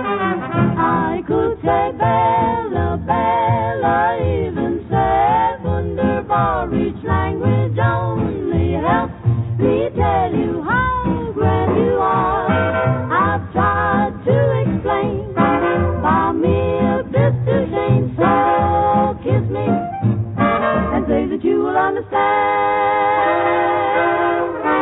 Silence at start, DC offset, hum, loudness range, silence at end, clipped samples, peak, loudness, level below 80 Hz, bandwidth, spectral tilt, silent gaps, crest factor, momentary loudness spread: 0 s; under 0.1%; none; 2 LU; 0 s; under 0.1%; -2 dBFS; -17 LUFS; -36 dBFS; 4 kHz; -12.5 dB/octave; none; 14 dB; 4 LU